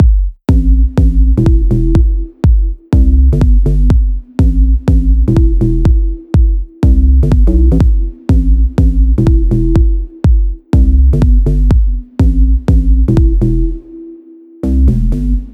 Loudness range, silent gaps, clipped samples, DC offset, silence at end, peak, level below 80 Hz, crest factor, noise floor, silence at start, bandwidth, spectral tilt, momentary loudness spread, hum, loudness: 1 LU; none; under 0.1%; under 0.1%; 0 s; 0 dBFS; -10 dBFS; 8 dB; -36 dBFS; 0 s; 3.9 kHz; -10 dB/octave; 5 LU; none; -12 LUFS